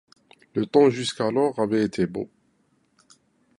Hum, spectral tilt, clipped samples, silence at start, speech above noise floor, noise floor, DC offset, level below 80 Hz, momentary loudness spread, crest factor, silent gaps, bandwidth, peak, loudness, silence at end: none; -6 dB/octave; under 0.1%; 0.55 s; 44 dB; -66 dBFS; under 0.1%; -62 dBFS; 13 LU; 20 dB; none; 11.5 kHz; -6 dBFS; -23 LUFS; 1.3 s